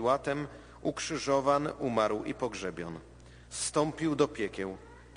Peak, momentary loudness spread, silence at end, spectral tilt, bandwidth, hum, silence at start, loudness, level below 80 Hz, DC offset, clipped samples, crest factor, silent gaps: -12 dBFS; 13 LU; 0 s; -4.5 dB/octave; 10 kHz; none; 0 s; -32 LUFS; -56 dBFS; under 0.1%; under 0.1%; 20 dB; none